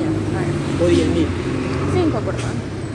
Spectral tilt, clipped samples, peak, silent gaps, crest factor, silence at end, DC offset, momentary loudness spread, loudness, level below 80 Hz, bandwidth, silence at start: -7 dB/octave; under 0.1%; -4 dBFS; none; 14 dB; 0 s; under 0.1%; 7 LU; -20 LUFS; -38 dBFS; 11.5 kHz; 0 s